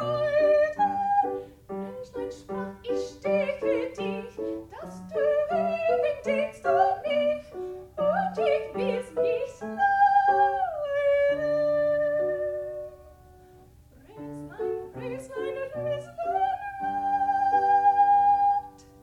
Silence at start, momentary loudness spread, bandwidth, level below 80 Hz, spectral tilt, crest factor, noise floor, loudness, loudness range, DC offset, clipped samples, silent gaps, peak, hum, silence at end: 0 s; 16 LU; 11 kHz; -58 dBFS; -6 dB/octave; 16 dB; -53 dBFS; -26 LUFS; 9 LU; under 0.1%; under 0.1%; none; -10 dBFS; none; 0.3 s